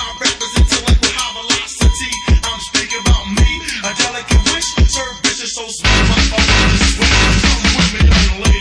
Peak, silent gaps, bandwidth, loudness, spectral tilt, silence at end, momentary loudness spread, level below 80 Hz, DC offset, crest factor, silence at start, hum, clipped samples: 0 dBFS; none; 11 kHz; -13 LUFS; -3.5 dB/octave; 0 s; 6 LU; -16 dBFS; under 0.1%; 12 dB; 0 s; none; under 0.1%